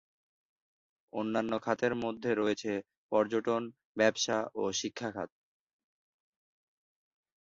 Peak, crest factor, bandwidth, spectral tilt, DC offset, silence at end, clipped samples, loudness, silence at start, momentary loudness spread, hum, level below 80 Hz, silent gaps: -12 dBFS; 22 dB; 7.8 kHz; -3.5 dB/octave; under 0.1%; 2.15 s; under 0.1%; -33 LUFS; 1.15 s; 9 LU; none; -72 dBFS; 2.97-3.09 s, 3.85-3.95 s